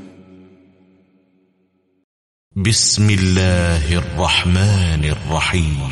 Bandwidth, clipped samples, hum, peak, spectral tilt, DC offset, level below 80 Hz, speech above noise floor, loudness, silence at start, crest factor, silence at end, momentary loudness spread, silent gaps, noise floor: 11.5 kHz; under 0.1%; none; -2 dBFS; -4 dB/octave; under 0.1%; -30 dBFS; 47 dB; -16 LUFS; 0 s; 16 dB; 0 s; 6 LU; 2.04-2.51 s; -62 dBFS